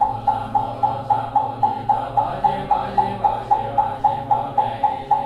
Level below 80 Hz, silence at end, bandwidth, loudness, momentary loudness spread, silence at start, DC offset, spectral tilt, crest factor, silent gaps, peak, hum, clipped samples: -46 dBFS; 0 s; 10 kHz; -21 LUFS; 3 LU; 0 s; under 0.1%; -7 dB/octave; 16 dB; none; -4 dBFS; none; under 0.1%